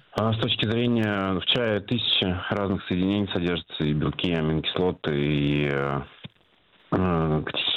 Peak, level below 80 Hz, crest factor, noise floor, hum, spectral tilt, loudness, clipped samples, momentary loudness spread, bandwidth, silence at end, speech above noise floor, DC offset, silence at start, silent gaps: -6 dBFS; -46 dBFS; 18 dB; -61 dBFS; none; -7.5 dB/octave; -25 LUFS; under 0.1%; 5 LU; 7.8 kHz; 0 s; 37 dB; under 0.1%; 0.15 s; none